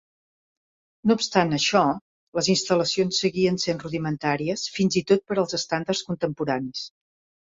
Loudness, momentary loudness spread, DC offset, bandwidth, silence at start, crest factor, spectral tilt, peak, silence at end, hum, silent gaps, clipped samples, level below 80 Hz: -24 LUFS; 8 LU; under 0.1%; 7.8 kHz; 1.05 s; 20 dB; -4.5 dB/octave; -4 dBFS; 0.7 s; none; 2.01-2.33 s; under 0.1%; -62 dBFS